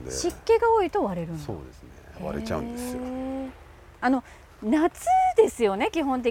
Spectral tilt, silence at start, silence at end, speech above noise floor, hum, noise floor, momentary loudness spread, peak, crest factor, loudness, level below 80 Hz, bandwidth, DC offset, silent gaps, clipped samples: -5 dB/octave; 0 s; 0 s; 23 dB; none; -48 dBFS; 15 LU; -6 dBFS; 18 dB; -25 LUFS; -48 dBFS; 16.5 kHz; under 0.1%; none; under 0.1%